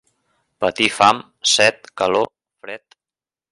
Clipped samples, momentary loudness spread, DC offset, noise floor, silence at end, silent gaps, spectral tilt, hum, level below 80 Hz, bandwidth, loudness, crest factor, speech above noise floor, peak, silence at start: under 0.1%; 20 LU; under 0.1%; under -90 dBFS; 0.75 s; none; -1.5 dB/octave; none; -58 dBFS; 11.5 kHz; -17 LUFS; 20 dB; over 73 dB; 0 dBFS; 0.6 s